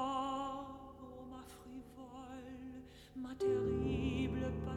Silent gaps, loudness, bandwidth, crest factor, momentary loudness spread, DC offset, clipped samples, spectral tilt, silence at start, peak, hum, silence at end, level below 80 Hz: none; -40 LUFS; 14.5 kHz; 16 dB; 17 LU; under 0.1%; under 0.1%; -7 dB/octave; 0 s; -26 dBFS; none; 0 s; -54 dBFS